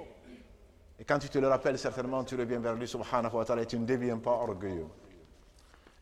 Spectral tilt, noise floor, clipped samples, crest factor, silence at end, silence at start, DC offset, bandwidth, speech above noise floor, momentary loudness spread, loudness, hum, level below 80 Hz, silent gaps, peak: -6 dB/octave; -59 dBFS; under 0.1%; 20 dB; 0.8 s; 0 s; under 0.1%; 13.5 kHz; 27 dB; 12 LU; -32 LUFS; none; -58 dBFS; none; -12 dBFS